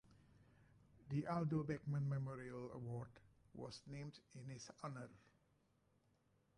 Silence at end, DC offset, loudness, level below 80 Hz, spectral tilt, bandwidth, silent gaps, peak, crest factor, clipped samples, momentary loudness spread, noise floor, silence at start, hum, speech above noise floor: 1.4 s; under 0.1%; -47 LUFS; -74 dBFS; -7.5 dB/octave; 10.5 kHz; none; -32 dBFS; 18 dB; under 0.1%; 14 LU; -79 dBFS; 0.1 s; none; 33 dB